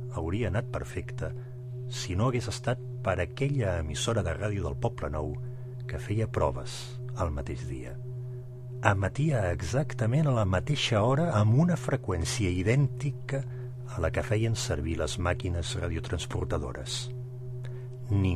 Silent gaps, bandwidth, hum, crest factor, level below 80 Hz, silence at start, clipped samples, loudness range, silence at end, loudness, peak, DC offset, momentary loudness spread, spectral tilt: none; 14 kHz; none; 26 dB; -42 dBFS; 0 s; under 0.1%; 6 LU; 0 s; -30 LUFS; -4 dBFS; under 0.1%; 13 LU; -6 dB/octave